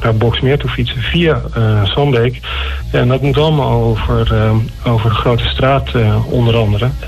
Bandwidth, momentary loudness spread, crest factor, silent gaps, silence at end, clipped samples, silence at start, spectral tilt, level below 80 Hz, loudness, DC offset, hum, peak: 13 kHz; 4 LU; 10 dB; none; 0 s; under 0.1%; 0 s; -7.5 dB/octave; -24 dBFS; -13 LUFS; under 0.1%; none; -2 dBFS